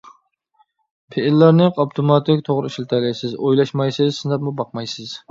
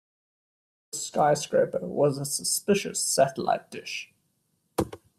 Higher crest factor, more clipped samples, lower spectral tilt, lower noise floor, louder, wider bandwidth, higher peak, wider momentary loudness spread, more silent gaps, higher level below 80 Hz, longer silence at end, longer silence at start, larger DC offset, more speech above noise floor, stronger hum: about the same, 18 dB vs 20 dB; neither; first, -7.5 dB/octave vs -3.5 dB/octave; second, -62 dBFS vs -73 dBFS; first, -18 LUFS vs -26 LUFS; second, 7.6 kHz vs 16 kHz; first, 0 dBFS vs -8 dBFS; about the same, 13 LU vs 12 LU; neither; about the same, -64 dBFS vs -62 dBFS; about the same, 0.1 s vs 0.2 s; first, 1.1 s vs 0.95 s; neither; about the same, 44 dB vs 47 dB; neither